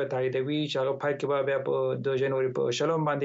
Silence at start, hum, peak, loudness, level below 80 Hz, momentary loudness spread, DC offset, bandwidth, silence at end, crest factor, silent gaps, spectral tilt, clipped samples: 0 s; none; -16 dBFS; -28 LUFS; -74 dBFS; 2 LU; under 0.1%; 8 kHz; 0 s; 12 dB; none; -5.5 dB/octave; under 0.1%